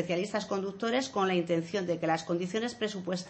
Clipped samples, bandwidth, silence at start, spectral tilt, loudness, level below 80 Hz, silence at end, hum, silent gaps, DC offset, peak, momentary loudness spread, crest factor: under 0.1%; 8.8 kHz; 0 s; -5 dB/octave; -31 LUFS; -72 dBFS; 0 s; none; none; under 0.1%; -16 dBFS; 4 LU; 16 dB